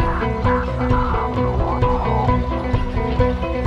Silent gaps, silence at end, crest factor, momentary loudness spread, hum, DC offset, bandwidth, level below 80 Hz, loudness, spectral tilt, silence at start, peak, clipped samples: none; 0 s; 16 dB; 3 LU; none; under 0.1%; 7.6 kHz; -24 dBFS; -20 LUFS; -8.5 dB/octave; 0 s; -2 dBFS; under 0.1%